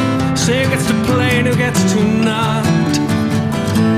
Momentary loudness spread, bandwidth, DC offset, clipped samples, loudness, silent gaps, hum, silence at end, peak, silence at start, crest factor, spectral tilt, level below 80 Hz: 2 LU; 16 kHz; under 0.1%; under 0.1%; -15 LUFS; none; none; 0 s; -2 dBFS; 0 s; 12 dB; -5.5 dB/octave; -40 dBFS